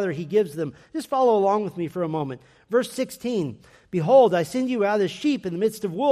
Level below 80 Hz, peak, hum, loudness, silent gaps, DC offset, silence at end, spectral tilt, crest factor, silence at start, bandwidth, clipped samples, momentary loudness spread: -66 dBFS; -6 dBFS; none; -23 LUFS; none; under 0.1%; 0 s; -6 dB/octave; 16 dB; 0 s; 15 kHz; under 0.1%; 13 LU